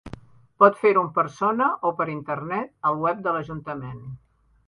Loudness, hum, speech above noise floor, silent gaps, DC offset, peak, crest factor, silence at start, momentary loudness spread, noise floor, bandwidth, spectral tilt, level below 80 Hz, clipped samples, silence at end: -23 LUFS; none; 21 dB; none; under 0.1%; -2 dBFS; 22 dB; 0.05 s; 16 LU; -44 dBFS; 11 kHz; -7.5 dB/octave; -58 dBFS; under 0.1%; 0.5 s